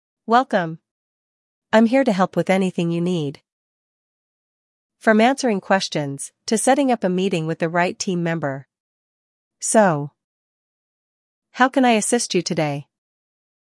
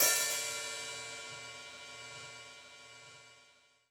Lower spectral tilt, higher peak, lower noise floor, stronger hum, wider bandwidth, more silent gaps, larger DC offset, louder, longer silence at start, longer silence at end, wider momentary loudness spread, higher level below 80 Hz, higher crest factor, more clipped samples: first, -4.5 dB/octave vs 1 dB/octave; first, -2 dBFS vs -14 dBFS; first, under -90 dBFS vs -66 dBFS; neither; second, 12 kHz vs over 20 kHz; first, 0.91-1.62 s, 3.52-4.90 s, 8.80-9.51 s, 10.24-11.42 s vs none; neither; first, -19 LUFS vs -37 LUFS; first, 0.3 s vs 0 s; first, 0.95 s vs 0.45 s; second, 11 LU vs 21 LU; first, -74 dBFS vs -80 dBFS; about the same, 20 dB vs 24 dB; neither